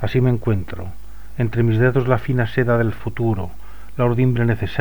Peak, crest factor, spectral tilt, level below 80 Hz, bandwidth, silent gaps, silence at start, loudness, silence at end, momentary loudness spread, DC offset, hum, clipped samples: -2 dBFS; 16 dB; -9 dB/octave; -38 dBFS; 19 kHz; none; 0 s; -19 LUFS; 0 s; 16 LU; 4%; none; under 0.1%